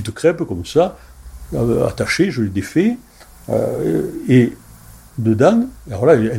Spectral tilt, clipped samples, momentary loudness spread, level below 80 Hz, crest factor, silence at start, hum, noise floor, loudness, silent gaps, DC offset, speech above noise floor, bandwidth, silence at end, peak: -7 dB/octave; under 0.1%; 8 LU; -42 dBFS; 16 dB; 0 s; none; -41 dBFS; -17 LUFS; none; under 0.1%; 25 dB; 16.5 kHz; 0 s; 0 dBFS